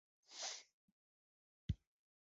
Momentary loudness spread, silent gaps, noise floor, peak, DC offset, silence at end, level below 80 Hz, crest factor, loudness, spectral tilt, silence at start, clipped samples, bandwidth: 8 LU; 0.73-1.69 s; under -90 dBFS; -28 dBFS; under 0.1%; 0.5 s; -60 dBFS; 24 dB; -50 LUFS; -4 dB/octave; 0.3 s; under 0.1%; 7.6 kHz